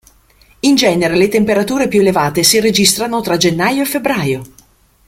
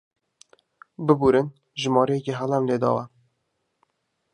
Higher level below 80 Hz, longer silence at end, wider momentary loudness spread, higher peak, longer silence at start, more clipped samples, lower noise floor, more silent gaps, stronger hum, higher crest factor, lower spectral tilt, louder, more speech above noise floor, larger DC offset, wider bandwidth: first, -46 dBFS vs -58 dBFS; second, 0.6 s vs 1.25 s; second, 6 LU vs 10 LU; first, 0 dBFS vs -4 dBFS; second, 0.65 s vs 1 s; neither; second, -49 dBFS vs -75 dBFS; neither; neither; second, 14 dB vs 22 dB; second, -3.5 dB/octave vs -6.5 dB/octave; first, -13 LUFS vs -23 LUFS; second, 36 dB vs 54 dB; neither; first, 17 kHz vs 10 kHz